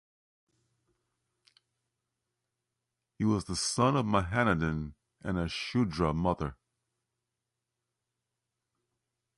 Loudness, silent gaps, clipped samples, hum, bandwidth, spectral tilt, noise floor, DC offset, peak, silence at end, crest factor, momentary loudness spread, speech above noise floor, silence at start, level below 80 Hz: -30 LUFS; none; under 0.1%; none; 11.5 kHz; -5.5 dB/octave; -87 dBFS; under 0.1%; -12 dBFS; 2.85 s; 22 dB; 10 LU; 57 dB; 3.2 s; -50 dBFS